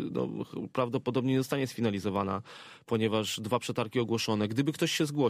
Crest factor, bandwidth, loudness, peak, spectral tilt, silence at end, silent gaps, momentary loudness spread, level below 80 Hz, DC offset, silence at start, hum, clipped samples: 16 dB; 15.5 kHz; -31 LUFS; -14 dBFS; -5.5 dB/octave; 0 s; none; 6 LU; -70 dBFS; under 0.1%; 0 s; none; under 0.1%